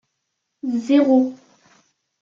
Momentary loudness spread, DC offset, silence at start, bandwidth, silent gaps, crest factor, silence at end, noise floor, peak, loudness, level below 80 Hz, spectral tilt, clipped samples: 11 LU; under 0.1%; 0.65 s; 7.4 kHz; none; 16 dB; 0.85 s; -76 dBFS; -6 dBFS; -18 LUFS; -70 dBFS; -6 dB/octave; under 0.1%